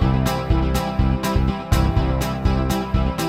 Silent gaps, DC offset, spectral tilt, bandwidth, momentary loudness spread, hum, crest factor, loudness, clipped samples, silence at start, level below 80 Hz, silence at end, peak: none; under 0.1%; -6.5 dB/octave; 16.5 kHz; 2 LU; none; 16 dB; -21 LUFS; under 0.1%; 0 s; -24 dBFS; 0 s; -4 dBFS